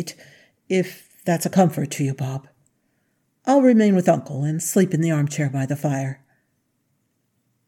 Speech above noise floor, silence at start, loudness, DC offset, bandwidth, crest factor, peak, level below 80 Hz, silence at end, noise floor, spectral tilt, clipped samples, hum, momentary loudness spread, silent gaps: 50 dB; 0 s; -21 LUFS; under 0.1%; 17.5 kHz; 20 dB; -2 dBFS; -74 dBFS; 1.55 s; -70 dBFS; -6.5 dB/octave; under 0.1%; none; 15 LU; none